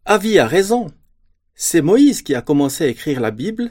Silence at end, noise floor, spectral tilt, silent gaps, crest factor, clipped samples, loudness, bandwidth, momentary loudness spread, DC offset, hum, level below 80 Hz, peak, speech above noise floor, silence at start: 0 s; -57 dBFS; -4.5 dB/octave; none; 16 dB; under 0.1%; -16 LUFS; 17 kHz; 9 LU; under 0.1%; none; -48 dBFS; 0 dBFS; 42 dB; 0.05 s